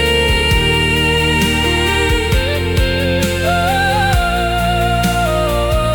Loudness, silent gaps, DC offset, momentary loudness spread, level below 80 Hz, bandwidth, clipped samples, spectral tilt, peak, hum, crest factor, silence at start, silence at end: -14 LUFS; none; under 0.1%; 3 LU; -22 dBFS; 18 kHz; under 0.1%; -4.5 dB/octave; -2 dBFS; none; 12 dB; 0 s; 0 s